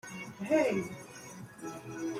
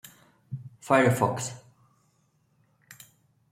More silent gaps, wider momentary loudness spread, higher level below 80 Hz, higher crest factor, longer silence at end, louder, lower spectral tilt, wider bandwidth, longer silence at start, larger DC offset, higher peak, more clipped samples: neither; second, 18 LU vs 28 LU; about the same, -72 dBFS vs -68 dBFS; about the same, 20 dB vs 24 dB; second, 0 s vs 1.95 s; second, -34 LUFS vs -25 LUFS; about the same, -5.5 dB/octave vs -5.5 dB/octave; about the same, 16 kHz vs 16 kHz; second, 0.05 s vs 0.5 s; neither; second, -16 dBFS vs -6 dBFS; neither